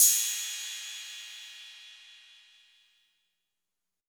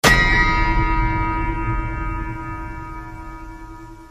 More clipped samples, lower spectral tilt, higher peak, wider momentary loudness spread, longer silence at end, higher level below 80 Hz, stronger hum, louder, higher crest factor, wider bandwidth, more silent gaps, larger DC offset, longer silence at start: neither; second, 9 dB/octave vs -4.5 dB/octave; second, -8 dBFS vs 0 dBFS; about the same, 24 LU vs 22 LU; first, 1.95 s vs 0 s; second, under -90 dBFS vs -24 dBFS; neither; second, -30 LUFS vs -20 LUFS; first, 26 dB vs 20 dB; first, over 20 kHz vs 15.5 kHz; neither; neither; about the same, 0 s vs 0.05 s